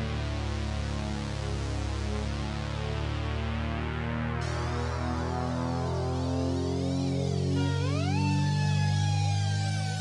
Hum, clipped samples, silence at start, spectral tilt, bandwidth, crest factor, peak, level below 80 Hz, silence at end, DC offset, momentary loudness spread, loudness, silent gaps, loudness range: none; under 0.1%; 0 s; -6 dB/octave; 11.5 kHz; 12 dB; -16 dBFS; -40 dBFS; 0 s; under 0.1%; 6 LU; -30 LUFS; none; 5 LU